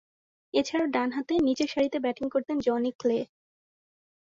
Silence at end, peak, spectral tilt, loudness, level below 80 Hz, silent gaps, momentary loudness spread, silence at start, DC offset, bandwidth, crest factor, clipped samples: 1 s; -12 dBFS; -4.5 dB/octave; -28 LUFS; -64 dBFS; 2.95-2.99 s; 4 LU; 0.55 s; under 0.1%; 7.8 kHz; 18 dB; under 0.1%